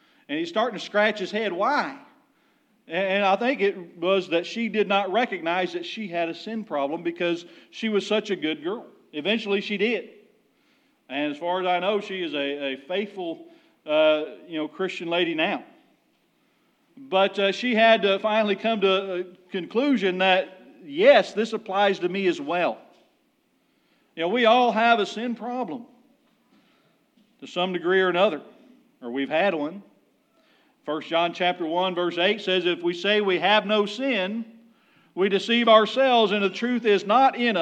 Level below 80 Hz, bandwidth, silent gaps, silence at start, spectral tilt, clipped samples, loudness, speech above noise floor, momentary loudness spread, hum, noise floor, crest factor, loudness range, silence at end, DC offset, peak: under -90 dBFS; 9 kHz; none; 0.3 s; -5 dB/octave; under 0.1%; -23 LUFS; 44 dB; 14 LU; none; -67 dBFS; 22 dB; 6 LU; 0 s; under 0.1%; -2 dBFS